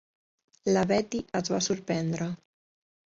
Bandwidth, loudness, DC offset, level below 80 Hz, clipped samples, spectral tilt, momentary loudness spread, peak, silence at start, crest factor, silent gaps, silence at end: 7.8 kHz; -29 LUFS; under 0.1%; -62 dBFS; under 0.1%; -5 dB/octave; 10 LU; -12 dBFS; 0.65 s; 18 dB; none; 0.8 s